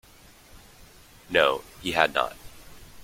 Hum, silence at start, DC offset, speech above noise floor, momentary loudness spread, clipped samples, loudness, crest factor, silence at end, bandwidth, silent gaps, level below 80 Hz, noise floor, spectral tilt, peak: none; 0.55 s; under 0.1%; 28 dB; 10 LU; under 0.1%; -25 LUFS; 28 dB; 0 s; 16.5 kHz; none; -54 dBFS; -52 dBFS; -3 dB/octave; -2 dBFS